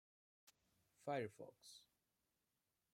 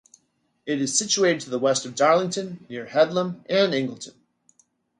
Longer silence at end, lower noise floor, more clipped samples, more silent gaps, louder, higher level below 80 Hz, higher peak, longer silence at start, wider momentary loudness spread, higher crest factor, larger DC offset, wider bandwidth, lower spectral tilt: first, 1.1 s vs 0.9 s; first, -90 dBFS vs -70 dBFS; neither; neither; second, -50 LUFS vs -23 LUFS; second, under -90 dBFS vs -72 dBFS; second, -32 dBFS vs -6 dBFS; second, 0.45 s vs 0.65 s; about the same, 16 LU vs 15 LU; about the same, 22 dB vs 20 dB; neither; first, 16 kHz vs 11 kHz; first, -5.5 dB/octave vs -3.5 dB/octave